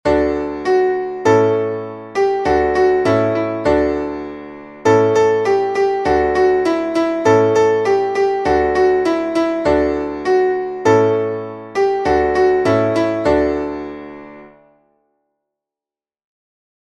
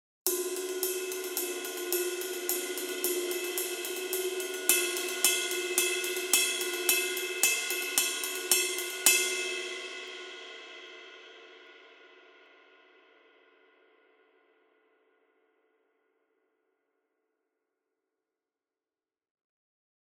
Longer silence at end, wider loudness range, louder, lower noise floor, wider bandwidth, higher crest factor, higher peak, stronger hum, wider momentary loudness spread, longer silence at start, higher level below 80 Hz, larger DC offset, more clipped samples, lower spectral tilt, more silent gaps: second, 2.45 s vs 7.8 s; second, 4 LU vs 14 LU; first, -16 LUFS vs -29 LUFS; about the same, under -90 dBFS vs under -90 dBFS; second, 9.8 kHz vs 17.5 kHz; second, 14 dB vs 30 dB; about the same, -2 dBFS vs -4 dBFS; neither; second, 10 LU vs 17 LU; second, 0.05 s vs 0.25 s; first, -40 dBFS vs under -90 dBFS; neither; neither; first, -6.5 dB/octave vs 2 dB/octave; neither